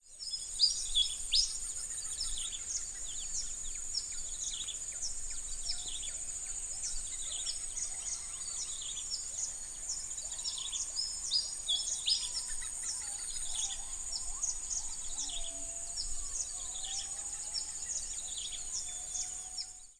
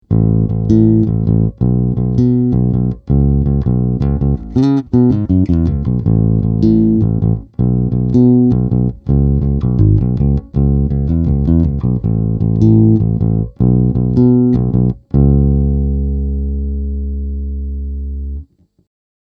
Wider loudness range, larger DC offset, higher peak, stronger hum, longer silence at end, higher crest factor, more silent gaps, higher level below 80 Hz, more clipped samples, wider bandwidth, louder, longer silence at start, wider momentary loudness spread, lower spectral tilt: about the same, 4 LU vs 3 LU; neither; second, -16 dBFS vs 0 dBFS; neither; second, 0.05 s vs 0.95 s; first, 22 dB vs 12 dB; neither; second, -50 dBFS vs -20 dBFS; neither; first, 11 kHz vs 4.6 kHz; second, -35 LUFS vs -14 LUFS; about the same, 0.05 s vs 0.1 s; about the same, 8 LU vs 9 LU; second, 2 dB/octave vs -12 dB/octave